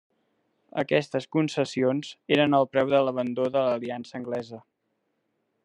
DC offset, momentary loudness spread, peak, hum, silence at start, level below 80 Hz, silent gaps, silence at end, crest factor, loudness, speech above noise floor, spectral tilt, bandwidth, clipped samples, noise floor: under 0.1%; 12 LU; -6 dBFS; none; 0.75 s; -74 dBFS; none; 1.05 s; 20 dB; -26 LUFS; 51 dB; -6 dB/octave; 10.5 kHz; under 0.1%; -76 dBFS